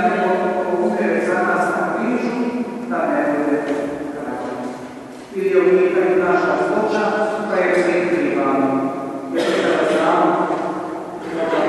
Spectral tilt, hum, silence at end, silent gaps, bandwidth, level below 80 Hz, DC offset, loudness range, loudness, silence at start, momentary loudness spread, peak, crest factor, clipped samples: -6 dB/octave; none; 0 s; none; 12 kHz; -60 dBFS; under 0.1%; 4 LU; -19 LUFS; 0 s; 11 LU; -2 dBFS; 16 dB; under 0.1%